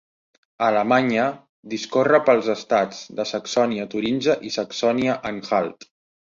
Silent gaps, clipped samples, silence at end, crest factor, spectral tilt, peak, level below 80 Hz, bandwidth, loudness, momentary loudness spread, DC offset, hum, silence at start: 1.49-1.63 s; under 0.1%; 0.45 s; 18 dB; -4.5 dB/octave; -2 dBFS; -64 dBFS; 7.6 kHz; -21 LUFS; 10 LU; under 0.1%; none; 0.6 s